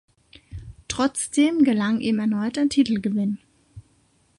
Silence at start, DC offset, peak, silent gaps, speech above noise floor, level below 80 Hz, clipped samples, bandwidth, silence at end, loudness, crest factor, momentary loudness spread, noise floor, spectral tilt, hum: 0.5 s; under 0.1%; -8 dBFS; none; 41 dB; -52 dBFS; under 0.1%; 11.5 kHz; 0.6 s; -22 LUFS; 16 dB; 21 LU; -62 dBFS; -4.5 dB/octave; none